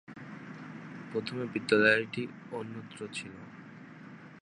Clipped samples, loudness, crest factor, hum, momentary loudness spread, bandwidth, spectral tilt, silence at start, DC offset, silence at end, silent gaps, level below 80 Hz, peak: under 0.1%; -31 LUFS; 24 dB; none; 24 LU; 11 kHz; -5 dB/octave; 0.1 s; under 0.1%; 0 s; none; -76 dBFS; -10 dBFS